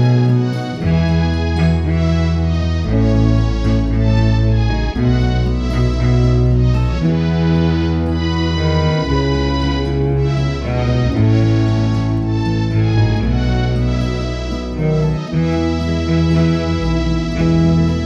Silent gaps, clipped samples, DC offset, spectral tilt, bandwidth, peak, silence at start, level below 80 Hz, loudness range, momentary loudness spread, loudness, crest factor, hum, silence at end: none; under 0.1%; under 0.1%; -7.5 dB/octave; 7.8 kHz; -2 dBFS; 0 s; -22 dBFS; 2 LU; 4 LU; -16 LUFS; 12 dB; none; 0 s